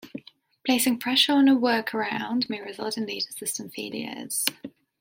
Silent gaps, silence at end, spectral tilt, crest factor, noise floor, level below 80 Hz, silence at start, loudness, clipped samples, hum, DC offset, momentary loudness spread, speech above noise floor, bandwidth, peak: none; 0.3 s; -2 dB/octave; 24 dB; -50 dBFS; -74 dBFS; 0.05 s; -25 LUFS; under 0.1%; none; under 0.1%; 14 LU; 24 dB; 16.5 kHz; -2 dBFS